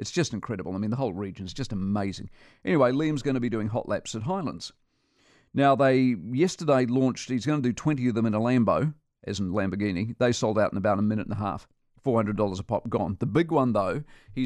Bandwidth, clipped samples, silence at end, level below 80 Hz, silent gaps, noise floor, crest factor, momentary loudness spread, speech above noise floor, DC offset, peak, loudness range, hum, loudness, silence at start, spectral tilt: 11 kHz; under 0.1%; 0 s; -54 dBFS; none; -65 dBFS; 16 dB; 11 LU; 39 dB; under 0.1%; -10 dBFS; 4 LU; none; -26 LUFS; 0 s; -6.5 dB/octave